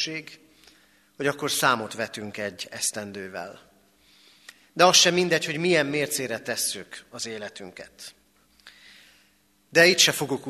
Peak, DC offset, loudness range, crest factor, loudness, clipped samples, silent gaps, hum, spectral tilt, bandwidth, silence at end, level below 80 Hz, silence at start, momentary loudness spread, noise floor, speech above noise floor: -2 dBFS; under 0.1%; 10 LU; 24 dB; -22 LUFS; under 0.1%; none; none; -2 dB/octave; 13.5 kHz; 0 s; -70 dBFS; 0 s; 23 LU; -64 dBFS; 39 dB